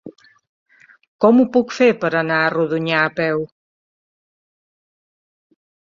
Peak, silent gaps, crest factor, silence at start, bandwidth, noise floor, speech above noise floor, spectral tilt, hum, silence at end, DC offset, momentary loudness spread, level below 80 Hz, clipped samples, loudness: -2 dBFS; 0.49-0.66 s, 1.08-1.19 s; 18 dB; 0.05 s; 7.4 kHz; under -90 dBFS; over 74 dB; -6.5 dB/octave; none; 2.5 s; under 0.1%; 7 LU; -64 dBFS; under 0.1%; -17 LUFS